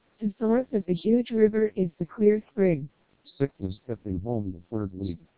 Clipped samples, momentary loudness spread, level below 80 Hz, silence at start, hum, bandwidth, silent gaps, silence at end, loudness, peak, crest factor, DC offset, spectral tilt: under 0.1%; 11 LU; -52 dBFS; 0.2 s; none; 4 kHz; none; 0.2 s; -27 LUFS; -8 dBFS; 18 dB; 0.2%; -12 dB/octave